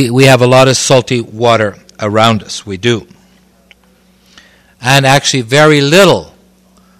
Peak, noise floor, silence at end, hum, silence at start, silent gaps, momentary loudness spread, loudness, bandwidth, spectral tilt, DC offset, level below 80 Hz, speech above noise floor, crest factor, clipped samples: 0 dBFS; -48 dBFS; 0.75 s; none; 0 s; none; 11 LU; -9 LUFS; 17.5 kHz; -4.5 dB/octave; under 0.1%; -46 dBFS; 40 dB; 10 dB; 2%